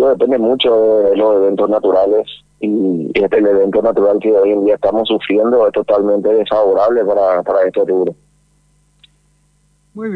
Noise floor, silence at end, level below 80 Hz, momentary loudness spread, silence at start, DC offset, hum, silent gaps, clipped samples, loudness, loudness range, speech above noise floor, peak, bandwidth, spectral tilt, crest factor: -56 dBFS; 0 s; -52 dBFS; 4 LU; 0 s; under 0.1%; 50 Hz at -50 dBFS; none; under 0.1%; -13 LUFS; 3 LU; 44 dB; -2 dBFS; 5 kHz; -7.5 dB/octave; 12 dB